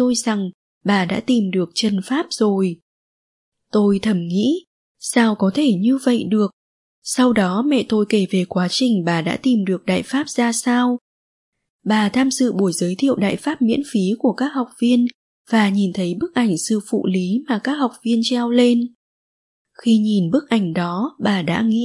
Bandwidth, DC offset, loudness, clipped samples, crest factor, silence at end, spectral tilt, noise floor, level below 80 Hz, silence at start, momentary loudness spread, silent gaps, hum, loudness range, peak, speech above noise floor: 11.5 kHz; under 0.1%; -19 LUFS; under 0.1%; 16 dB; 0 s; -5 dB/octave; under -90 dBFS; -62 dBFS; 0 s; 6 LU; 0.54-0.81 s, 2.82-3.52 s, 4.67-4.95 s, 6.53-7.02 s, 11.01-11.52 s, 11.70-11.79 s, 15.14-15.45 s, 18.95-19.65 s; none; 2 LU; -2 dBFS; over 72 dB